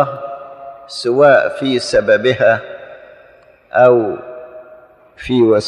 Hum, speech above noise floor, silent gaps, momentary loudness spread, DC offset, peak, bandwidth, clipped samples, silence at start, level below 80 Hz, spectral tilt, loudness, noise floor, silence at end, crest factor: none; 34 dB; none; 22 LU; under 0.1%; 0 dBFS; 10.5 kHz; under 0.1%; 0 s; -50 dBFS; -5.5 dB/octave; -13 LUFS; -46 dBFS; 0 s; 14 dB